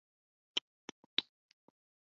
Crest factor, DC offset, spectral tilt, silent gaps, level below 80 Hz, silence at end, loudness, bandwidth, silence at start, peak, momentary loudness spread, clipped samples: 30 dB; under 0.1%; 2 dB/octave; 0.61-1.17 s; under -90 dBFS; 0.95 s; -39 LUFS; 7.2 kHz; 0.55 s; -16 dBFS; 17 LU; under 0.1%